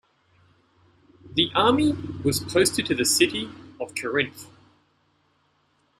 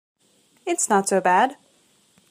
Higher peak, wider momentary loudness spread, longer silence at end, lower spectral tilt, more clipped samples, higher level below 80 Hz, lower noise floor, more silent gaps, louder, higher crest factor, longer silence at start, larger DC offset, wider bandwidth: about the same, -6 dBFS vs -6 dBFS; first, 13 LU vs 9 LU; first, 1.55 s vs 0.75 s; about the same, -3 dB/octave vs -3.5 dB/octave; neither; first, -56 dBFS vs -80 dBFS; first, -67 dBFS vs -61 dBFS; neither; second, -23 LUFS vs -20 LUFS; about the same, 20 dB vs 18 dB; first, 1.25 s vs 0.65 s; neither; about the same, 15 kHz vs 15.5 kHz